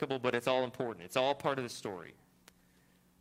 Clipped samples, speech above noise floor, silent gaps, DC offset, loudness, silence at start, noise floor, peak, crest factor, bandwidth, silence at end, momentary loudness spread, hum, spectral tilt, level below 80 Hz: under 0.1%; 32 dB; none; under 0.1%; -35 LUFS; 0 s; -67 dBFS; -14 dBFS; 24 dB; 16 kHz; 1.1 s; 12 LU; none; -4.5 dB/octave; -74 dBFS